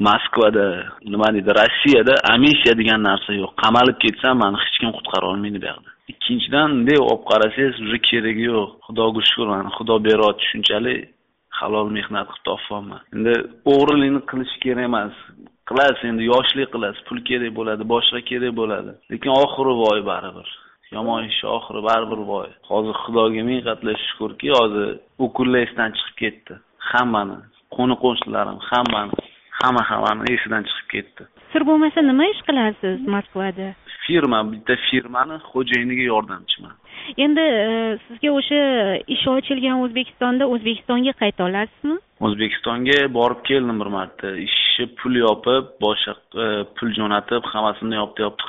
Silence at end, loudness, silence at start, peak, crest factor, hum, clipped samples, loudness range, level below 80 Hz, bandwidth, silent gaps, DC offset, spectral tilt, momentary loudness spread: 0 s; -19 LUFS; 0 s; -2 dBFS; 16 dB; none; under 0.1%; 6 LU; -54 dBFS; 7.6 kHz; none; under 0.1%; -2 dB/octave; 11 LU